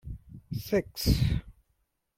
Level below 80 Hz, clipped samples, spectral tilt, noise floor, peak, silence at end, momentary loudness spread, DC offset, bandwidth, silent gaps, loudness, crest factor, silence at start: -38 dBFS; under 0.1%; -6 dB/octave; -76 dBFS; -10 dBFS; 0.65 s; 17 LU; under 0.1%; 16.5 kHz; none; -30 LUFS; 20 dB; 0.05 s